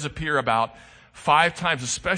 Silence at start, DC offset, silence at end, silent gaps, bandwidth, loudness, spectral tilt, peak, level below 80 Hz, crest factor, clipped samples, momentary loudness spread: 0 s; under 0.1%; 0 s; none; 9.8 kHz; -22 LUFS; -3 dB/octave; -4 dBFS; -48 dBFS; 20 dB; under 0.1%; 8 LU